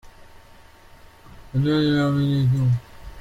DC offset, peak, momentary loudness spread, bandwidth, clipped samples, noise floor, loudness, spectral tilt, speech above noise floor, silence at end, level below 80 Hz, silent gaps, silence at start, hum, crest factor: under 0.1%; -10 dBFS; 6 LU; 8.8 kHz; under 0.1%; -48 dBFS; -21 LUFS; -8 dB/octave; 28 dB; 0 s; -46 dBFS; none; 1.35 s; none; 14 dB